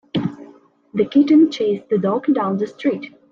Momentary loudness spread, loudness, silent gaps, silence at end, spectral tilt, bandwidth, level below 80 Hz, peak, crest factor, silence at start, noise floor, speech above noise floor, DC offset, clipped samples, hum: 12 LU; -18 LUFS; none; 0.25 s; -7.5 dB/octave; 7.2 kHz; -62 dBFS; -4 dBFS; 14 dB; 0.15 s; -47 dBFS; 30 dB; under 0.1%; under 0.1%; none